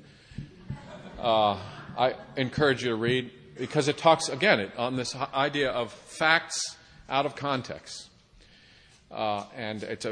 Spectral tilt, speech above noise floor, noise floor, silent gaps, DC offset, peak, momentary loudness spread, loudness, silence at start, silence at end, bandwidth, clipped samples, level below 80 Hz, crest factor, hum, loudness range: -4 dB/octave; 29 dB; -57 dBFS; none; under 0.1%; -4 dBFS; 19 LU; -27 LUFS; 0.3 s; 0 s; 10 kHz; under 0.1%; -58 dBFS; 24 dB; none; 7 LU